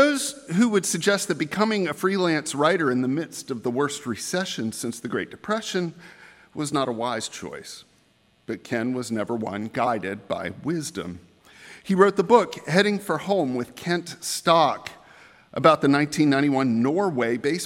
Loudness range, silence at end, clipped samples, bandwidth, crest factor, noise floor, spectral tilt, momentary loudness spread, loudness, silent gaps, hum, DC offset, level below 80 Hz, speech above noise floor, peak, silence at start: 8 LU; 0 s; under 0.1%; 16 kHz; 22 dB; -62 dBFS; -4.5 dB/octave; 13 LU; -24 LUFS; none; none; under 0.1%; -68 dBFS; 38 dB; -2 dBFS; 0 s